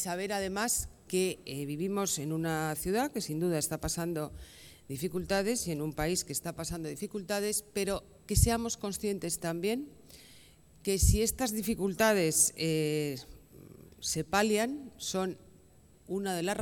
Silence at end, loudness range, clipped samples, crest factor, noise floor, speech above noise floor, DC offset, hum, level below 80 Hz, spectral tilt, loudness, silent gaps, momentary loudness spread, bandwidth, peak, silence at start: 0 s; 5 LU; under 0.1%; 22 dB; -60 dBFS; 28 dB; under 0.1%; none; -44 dBFS; -4 dB/octave; -32 LUFS; none; 11 LU; 18 kHz; -10 dBFS; 0 s